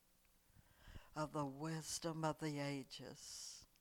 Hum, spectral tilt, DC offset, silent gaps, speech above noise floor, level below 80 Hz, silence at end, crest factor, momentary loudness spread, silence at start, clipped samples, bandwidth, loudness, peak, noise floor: none; -4.5 dB/octave; under 0.1%; none; 29 dB; -70 dBFS; 0.15 s; 20 dB; 10 LU; 0.55 s; under 0.1%; 19 kHz; -46 LUFS; -28 dBFS; -75 dBFS